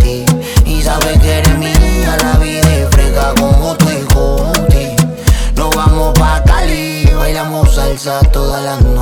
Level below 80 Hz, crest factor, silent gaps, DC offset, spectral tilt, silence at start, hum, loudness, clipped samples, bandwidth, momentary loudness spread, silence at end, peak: -12 dBFS; 10 dB; none; under 0.1%; -5 dB/octave; 0 s; none; -11 LUFS; under 0.1%; 19.5 kHz; 4 LU; 0 s; 0 dBFS